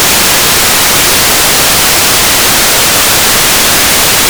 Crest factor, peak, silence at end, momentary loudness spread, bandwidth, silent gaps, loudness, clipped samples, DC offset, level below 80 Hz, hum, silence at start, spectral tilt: 6 dB; 0 dBFS; 0 s; 0 LU; over 20 kHz; none; -4 LUFS; 9%; 2%; -28 dBFS; none; 0 s; -0.5 dB/octave